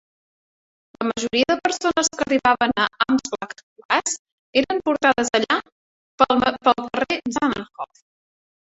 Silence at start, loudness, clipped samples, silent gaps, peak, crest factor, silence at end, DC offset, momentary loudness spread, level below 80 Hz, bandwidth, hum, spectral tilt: 1 s; -21 LUFS; under 0.1%; 3.63-3.76 s, 3.85-3.89 s, 4.19-4.25 s, 4.32-4.53 s, 5.72-6.18 s; -2 dBFS; 20 dB; 0.8 s; under 0.1%; 12 LU; -56 dBFS; 8.4 kHz; none; -2.5 dB/octave